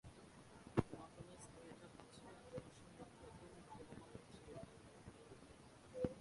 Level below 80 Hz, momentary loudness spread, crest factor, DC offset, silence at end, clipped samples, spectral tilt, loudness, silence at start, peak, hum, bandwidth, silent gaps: -66 dBFS; 17 LU; 32 dB; under 0.1%; 0 s; under 0.1%; -6.5 dB/octave; -54 LUFS; 0.05 s; -22 dBFS; none; 11.5 kHz; none